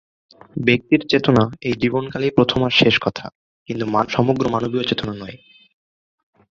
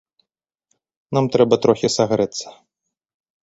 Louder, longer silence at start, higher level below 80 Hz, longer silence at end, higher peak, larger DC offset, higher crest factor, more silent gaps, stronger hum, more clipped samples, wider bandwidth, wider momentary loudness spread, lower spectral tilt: about the same, -18 LUFS vs -18 LUFS; second, 0.55 s vs 1.1 s; first, -50 dBFS vs -58 dBFS; first, 1.15 s vs 0.95 s; about the same, -2 dBFS vs -2 dBFS; neither; about the same, 18 dB vs 20 dB; first, 3.35-3.66 s vs none; neither; neither; second, 7.4 kHz vs 8.2 kHz; first, 15 LU vs 11 LU; about the same, -6.5 dB/octave vs -5.5 dB/octave